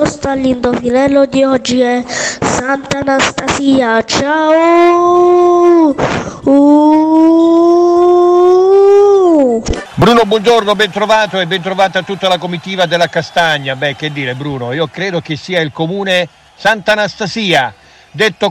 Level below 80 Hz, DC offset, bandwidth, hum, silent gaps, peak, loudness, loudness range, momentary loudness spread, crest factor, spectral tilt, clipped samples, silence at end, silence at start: -38 dBFS; under 0.1%; 11.5 kHz; none; none; 0 dBFS; -10 LUFS; 7 LU; 9 LU; 10 dB; -5 dB/octave; under 0.1%; 0 s; 0 s